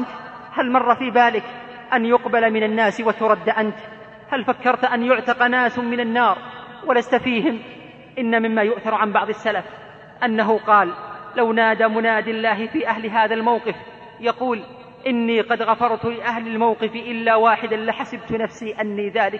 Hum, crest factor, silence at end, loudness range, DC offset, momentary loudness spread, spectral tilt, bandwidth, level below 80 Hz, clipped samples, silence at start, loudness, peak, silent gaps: none; 18 dB; 0 s; 3 LU; under 0.1%; 12 LU; -6 dB/octave; 8 kHz; -62 dBFS; under 0.1%; 0 s; -20 LUFS; -2 dBFS; none